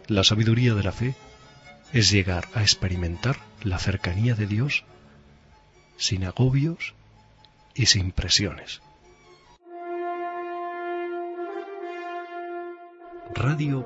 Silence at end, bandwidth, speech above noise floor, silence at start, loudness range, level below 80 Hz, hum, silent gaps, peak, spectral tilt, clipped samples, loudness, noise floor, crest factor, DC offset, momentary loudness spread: 0 s; 8 kHz; 32 dB; 0.1 s; 10 LU; -44 dBFS; none; none; -2 dBFS; -4 dB/octave; under 0.1%; -25 LUFS; -55 dBFS; 24 dB; under 0.1%; 17 LU